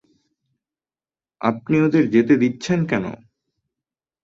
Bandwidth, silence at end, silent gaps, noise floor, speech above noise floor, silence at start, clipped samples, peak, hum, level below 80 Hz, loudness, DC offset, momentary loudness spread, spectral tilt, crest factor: 7.8 kHz; 1.1 s; none; under -90 dBFS; over 72 dB; 1.4 s; under 0.1%; -4 dBFS; none; -58 dBFS; -19 LUFS; under 0.1%; 8 LU; -7 dB/octave; 18 dB